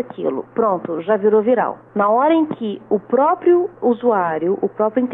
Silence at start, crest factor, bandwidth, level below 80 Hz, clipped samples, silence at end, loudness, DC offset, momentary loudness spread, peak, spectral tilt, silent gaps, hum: 0 s; 12 dB; 3.9 kHz; -66 dBFS; under 0.1%; 0 s; -18 LUFS; under 0.1%; 8 LU; -6 dBFS; -10.5 dB/octave; none; none